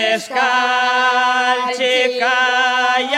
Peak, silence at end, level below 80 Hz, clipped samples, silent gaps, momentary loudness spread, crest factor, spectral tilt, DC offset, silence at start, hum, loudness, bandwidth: -2 dBFS; 0 s; -76 dBFS; under 0.1%; none; 3 LU; 12 dB; -0.5 dB/octave; under 0.1%; 0 s; none; -15 LUFS; 14.5 kHz